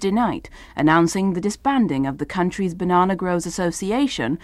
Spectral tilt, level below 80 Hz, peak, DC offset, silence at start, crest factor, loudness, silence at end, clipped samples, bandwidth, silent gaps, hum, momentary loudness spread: -5.5 dB/octave; -46 dBFS; -4 dBFS; under 0.1%; 0 s; 16 dB; -21 LUFS; 0.05 s; under 0.1%; 13.5 kHz; none; none; 7 LU